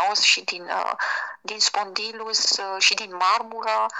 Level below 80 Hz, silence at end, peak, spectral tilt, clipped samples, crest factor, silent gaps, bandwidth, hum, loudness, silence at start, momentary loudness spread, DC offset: -84 dBFS; 0 s; -4 dBFS; 2 dB/octave; under 0.1%; 20 dB; none; 12 kHz; none; -22 LUFS; 0 s; 10 LU; under 0.1%